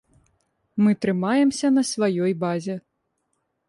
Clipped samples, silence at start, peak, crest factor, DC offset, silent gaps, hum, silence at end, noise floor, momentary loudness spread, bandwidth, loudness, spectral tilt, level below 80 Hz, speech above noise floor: under 0.1%; 0.75 s; -10 dBFS; 14 dB; under 0.1%; none; none; 0.9 s; -74 dBFS; 12 LU; 11.5 kHz; -22 LUFS; -5.5 dB/octave; -66 dBFS; 53 dB